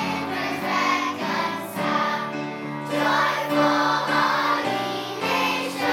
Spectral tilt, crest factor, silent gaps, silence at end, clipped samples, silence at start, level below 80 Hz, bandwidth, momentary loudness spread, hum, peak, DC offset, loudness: -4 dB/octave; 18 dB; none; 0 s; under 0.1%; 0 s; -80 dBFS; 17.5 kHz; 7 LU; none; -6 dBFS; under 0.1%; -23 LUFS